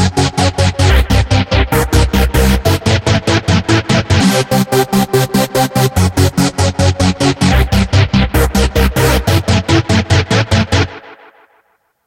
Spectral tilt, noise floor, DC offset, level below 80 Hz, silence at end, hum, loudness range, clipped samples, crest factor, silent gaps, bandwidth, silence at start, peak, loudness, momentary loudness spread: -5 dB/octave; -57 dBFS; under 0.1%; -20 dBFS; 0.9 s; none; 1 LU; under 0.1%; 12 dB; none; 16.5 kHz; 0 s; 0 dBFS; -12 LUFS; 2 LU